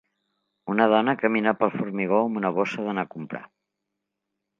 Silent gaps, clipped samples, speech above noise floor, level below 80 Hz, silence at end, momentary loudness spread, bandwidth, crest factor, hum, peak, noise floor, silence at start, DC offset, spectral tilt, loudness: none; under 0.1%; 59 dB; -74 dBFS; 1.15 s; 16 LU; 7.4 kHz; 22 dB; none; -4 dBFS; -82 dBFS; 0.65 s; under 0.1%; -7 dB/octave; -24 LUFS